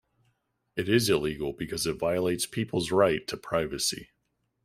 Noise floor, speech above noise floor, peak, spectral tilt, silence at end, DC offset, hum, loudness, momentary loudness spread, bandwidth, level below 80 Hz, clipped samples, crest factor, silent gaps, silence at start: -77 dBFS; 49 dB; -8 dBFS; -4 dB/octave; 0.6 s; under 0.1%; none; -28 LUFS; 9 LU; 16 kHz; -56 dBFS; under 0.1%; 20 dB; none; 0.75 s